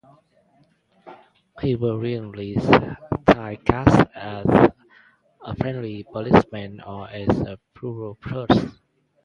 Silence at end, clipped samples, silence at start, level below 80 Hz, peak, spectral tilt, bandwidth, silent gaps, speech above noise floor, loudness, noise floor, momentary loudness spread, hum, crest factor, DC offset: 0.55 s; under 0.1%; 1.05 s; -42 dBFS; 0 dBFS; -8 dB/octave; 10 kHz; none; 40 dB; -21 LUFS; -61 dBFS; 18 LU; none; 22 dB; under 0.1%